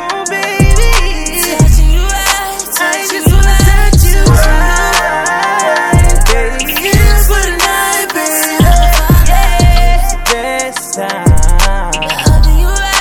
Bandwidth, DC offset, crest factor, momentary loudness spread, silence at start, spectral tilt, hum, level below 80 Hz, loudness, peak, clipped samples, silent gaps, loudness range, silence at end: 20 kHz; under 0.1%; 8 dB; 5 LU; 0 s; -4 dB/octave; none; -10 dBFS; -10 LUFS; 0 dBFS; 2%; none; 2 LU; 0 s